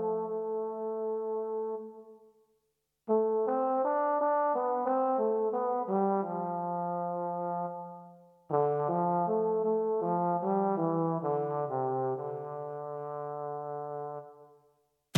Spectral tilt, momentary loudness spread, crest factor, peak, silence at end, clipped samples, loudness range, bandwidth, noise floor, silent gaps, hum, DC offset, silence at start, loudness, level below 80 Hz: -7.5 dB/octave; 10 LU; 18 dB; -12 dBFS; 0 s; under 0.1%; 6 LU; 3 kHz; -80 dBFS; none; none; under 0.1%; 0 s; -32 LUFS; under -90 dBFS